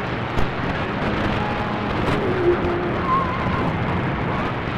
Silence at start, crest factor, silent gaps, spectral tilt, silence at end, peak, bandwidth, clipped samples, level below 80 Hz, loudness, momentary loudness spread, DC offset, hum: 0 s; 14 dB; none; -7.5 dB/octave; 0 s; -8 dBFS; 12 kHz; under 0.1%; -36 dBFS; -22 LUFS; 4 LU; under 0.1%; none